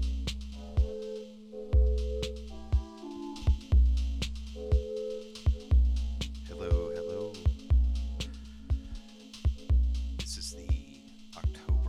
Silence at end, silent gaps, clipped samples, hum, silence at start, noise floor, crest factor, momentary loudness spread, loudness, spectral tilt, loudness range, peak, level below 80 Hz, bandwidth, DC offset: 0 s; none; under 0.1%; none; 0 s; -50 dBFS; 14 dB; 15 LU; -32 LUFS; -6.5 dB/octave; 4 LU; -16 dBFS; -30 dBFS; 10.5 kHz; under 0.1%